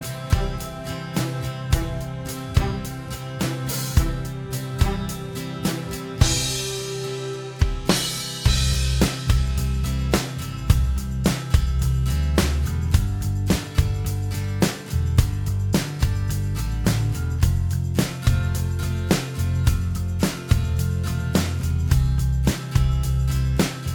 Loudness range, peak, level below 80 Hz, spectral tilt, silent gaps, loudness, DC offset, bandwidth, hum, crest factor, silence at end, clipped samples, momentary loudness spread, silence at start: 3 LU; -2 dBFS; -26 dBFS; -5 dB/octave; none; -24 LUFS; under 0.1%; 20 kHz; none; 20 dB; 0 s; under 0.1%; 8 LU; 0 s